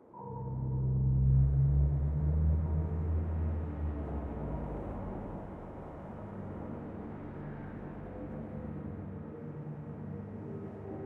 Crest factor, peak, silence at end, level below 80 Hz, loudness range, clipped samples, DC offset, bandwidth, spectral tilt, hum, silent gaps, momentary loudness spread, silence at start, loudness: 16 dB; -18 dBFS; 0 s; -40 dBFS; 12 LU; under 0.1%; under 0.1%; 3 kHz; -12 dB/octave; none; none; 15 LU; 0 s; -36 LUFS